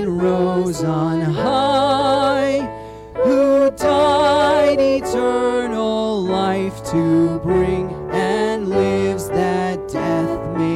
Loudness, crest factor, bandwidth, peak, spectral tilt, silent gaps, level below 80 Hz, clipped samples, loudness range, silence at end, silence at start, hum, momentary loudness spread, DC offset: -17 LUFS; 10 dB; 14.5 kHz; -8 dBFS; -6 dB/octave; none; -42 dBFS; under 0.1%; 3 LU; 0 s; 0 s; none; 7 LU; under 0.1%